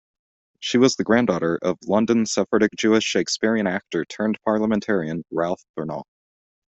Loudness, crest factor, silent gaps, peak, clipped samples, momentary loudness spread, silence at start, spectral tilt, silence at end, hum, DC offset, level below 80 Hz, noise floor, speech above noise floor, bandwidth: -22 LUFS; 18 dB; 5.69-5.74 s; -4 dBFS; under 0.1%; 10 LU; 0.6 s; -4.5 dB/octave; 0.65 s; none; under 0.1%; -60 dBFS; under -90 dBFS; over 69 dB; 8.2 kHz